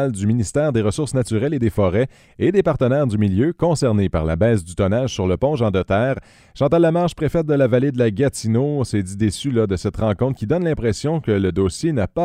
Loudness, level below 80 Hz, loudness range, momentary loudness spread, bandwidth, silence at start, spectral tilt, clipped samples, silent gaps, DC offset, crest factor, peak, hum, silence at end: -19 LUFS; -40 dBFS; 2 LU; 4 LU; 13.5 kHz; 0 s; -7 dB/octave; under 0.1%; none; under 0.1%; 16 dB; -4 dBFS; none; 0 s